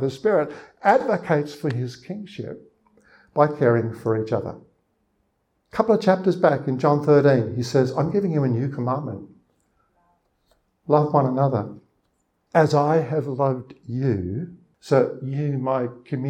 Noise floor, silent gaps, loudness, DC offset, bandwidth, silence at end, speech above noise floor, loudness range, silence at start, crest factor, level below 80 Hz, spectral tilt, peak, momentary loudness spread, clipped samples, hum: -71 dBFS; none; -22 LUFS; under 0.1%; 9.8 kHz; 0 s; 49 dB; 5 LU; 0 s; 20 dB; -62 dBFS; -8 dB/octave; -2 dBFS; 15 LU; under 0.1%; none